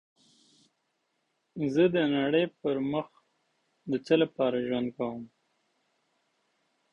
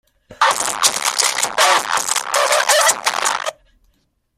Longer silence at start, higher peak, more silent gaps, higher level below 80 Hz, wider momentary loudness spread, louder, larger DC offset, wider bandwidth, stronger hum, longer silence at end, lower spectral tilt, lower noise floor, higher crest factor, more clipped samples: first, 1.55 s vs 0.3 s; second, -10 dBFS vs 0 dBFS; neither; second, -70 dBFS vs -60 dBFS; first, 15 LU vs 6 LU; second, -28 LUFS vs -15 LUFS; neither; second, 8 kHz vs 16 kHz; neither; first, 1.65 s vs 0.85 s; first, -7 dB/octave vs 1.5 dB/octave; first, -78 dBFS vs -63 dBFS; about the same, 20 dB vs 18 dB; neither